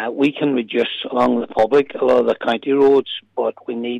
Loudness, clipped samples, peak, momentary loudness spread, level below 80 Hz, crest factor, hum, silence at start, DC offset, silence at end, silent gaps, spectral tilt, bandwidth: -18 LUFS; under 0.1%; -6 dBFS; 9 LU; -58 dBFS; 12 dB; none; 0 s; under 0.1%; 0 s; none; -6.5 dB/octave; 7.8 kHz